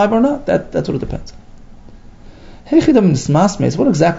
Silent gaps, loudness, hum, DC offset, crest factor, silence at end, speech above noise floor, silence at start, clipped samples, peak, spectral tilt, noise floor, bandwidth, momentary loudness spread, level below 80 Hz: none; -14 LUFS; none; under 0.1%; 16 dB; 0 s; 23 dB; 0 s; under 0.1%; 0 dBFS; -7 dB/octave; -37 dBFS; 7.8 kHz; 10 LU; -36 dBFS